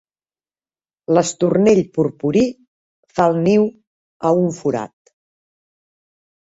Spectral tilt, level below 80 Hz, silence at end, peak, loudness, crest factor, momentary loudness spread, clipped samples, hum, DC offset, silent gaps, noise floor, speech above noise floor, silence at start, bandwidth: -6.5 dB/octave; -56 dBFS; 1.6 s; -2 dBFS; -17 LUFS; 18 dB; 10 LU; under 0.1%; none; under 0.1%; 2.68-3.03 s, 3.87-4.20 s; under -90 dBFS; over 74 dB; 1.1 s; 8 kHz